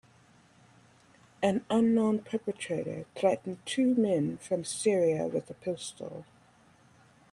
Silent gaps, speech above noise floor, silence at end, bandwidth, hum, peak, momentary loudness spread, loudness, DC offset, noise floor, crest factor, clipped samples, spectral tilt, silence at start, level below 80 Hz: none; 32 dB; 1.1 s; 11.5 kHz; none; -12 dBFS; 12 LU; -30 LUFS; under 0.1%; -61 dBFS; 18 dB; under 0.1%; -5.5 dB/octave; 1.4 s; -72 dBFS